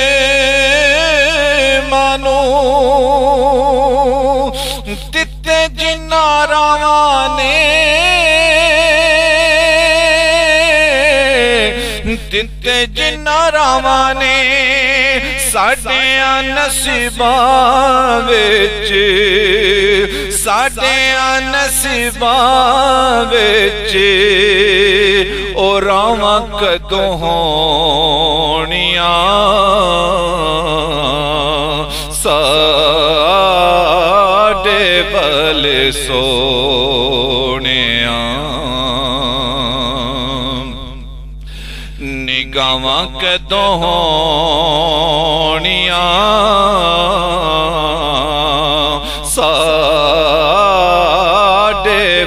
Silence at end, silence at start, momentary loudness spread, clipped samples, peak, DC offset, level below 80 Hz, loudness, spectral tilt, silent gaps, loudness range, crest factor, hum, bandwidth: 0 s; 0 s; 7 LU; under 0.1%; 0 dBFS; under 0.1%; -28 dBFS; -11 LUFS; -2.5 dB/octave; none; 4 LU; 12 dB; none; 15.5 kHz